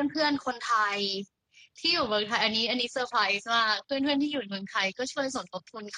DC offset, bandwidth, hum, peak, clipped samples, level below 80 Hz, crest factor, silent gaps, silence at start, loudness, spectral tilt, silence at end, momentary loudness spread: under 0.1%; 11 kHz; none; -10 dBFS; under 0.1%; -68 dBFS; 20 dB; none; 0 s; -28 LUFS; -2.5 dB/octave; 0 s; 8 LU